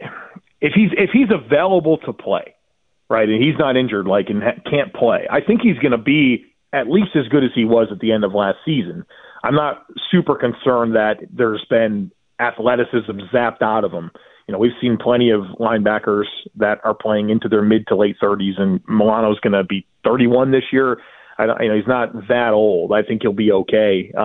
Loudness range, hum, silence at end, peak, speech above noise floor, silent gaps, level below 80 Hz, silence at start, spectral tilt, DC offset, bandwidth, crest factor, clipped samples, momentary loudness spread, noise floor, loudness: 2 LU; none; 0 s; -2 dBFS; 53 dB; none; -54 dBFS; 0 s; -10 dB/octave; under 0.1%; 4.1 kHz; 14 dB; under 0.1%; 8 LU; -69 dBFS; -17 LUFS